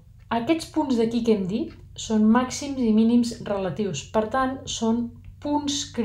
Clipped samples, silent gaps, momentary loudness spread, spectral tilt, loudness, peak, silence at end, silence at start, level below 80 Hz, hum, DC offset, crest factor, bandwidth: under 0.1%; none; 9 LU; -5 dB/octave; -24 LUFS; -8 dBFS; 0 s; 0.3 s; -50 dBFS; none; under 0.1%; 16 dB; 12 kHz